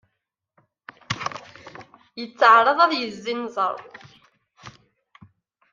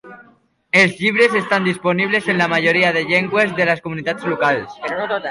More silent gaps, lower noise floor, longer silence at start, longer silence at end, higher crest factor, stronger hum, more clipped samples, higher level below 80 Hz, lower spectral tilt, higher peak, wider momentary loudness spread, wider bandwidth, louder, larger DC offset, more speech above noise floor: neither; first, -79 dBFS vs -54 dBFS; first, 1.1 s vs 0.05 s; first, 1 s vs 0 s; first, 22 dB vs 16 dB; neither; neither; second, -68 dBFS vs -60 dBFS; about the same, -4 dB/octave vs -5 dB/octave; about the same, -2 dBFS vs -2 dBFS; first, 27 LU vs 8 LU; second, 7.6 kHz vs 11.5 kHz; second, -20 LUFS vs -16 LUFS; neither; first, 60 dB vs 37 dB